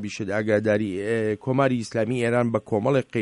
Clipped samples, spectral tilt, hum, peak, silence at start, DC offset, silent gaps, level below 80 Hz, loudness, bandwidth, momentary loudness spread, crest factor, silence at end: under 0.1%; -7 dB/octave; none; -8 dBFS; 0 s; under 0.1%; none; -60 dBFS; -24 LUFS; 11 kHz; 4 LU; 16 dB; 0 s